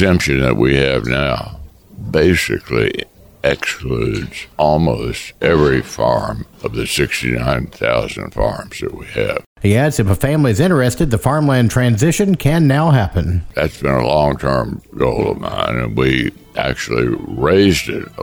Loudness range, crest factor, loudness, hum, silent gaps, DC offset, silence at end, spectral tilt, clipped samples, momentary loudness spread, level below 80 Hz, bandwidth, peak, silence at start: 4 LU; 14 dB; -16 LUFS; none; 9.46-9.56 s; under 0.1%; 0 s; -6 dB/octave; under 0.1%; 10 LU; -32 dBFS; over 20 kHz; -2 dBFS; 0 s